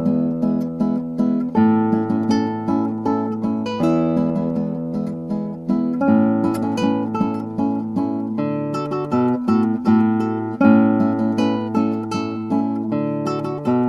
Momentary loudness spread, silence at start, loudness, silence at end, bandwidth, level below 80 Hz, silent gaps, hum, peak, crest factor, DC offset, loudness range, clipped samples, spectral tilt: 7 LU; 0 s; -20 LUFS; 0 s; 11 kHz; -56 dBFS; none; none; -2 dBFS; 18 dB; under 0.1%; 3 LU; under 0.1%; -8 dB/octave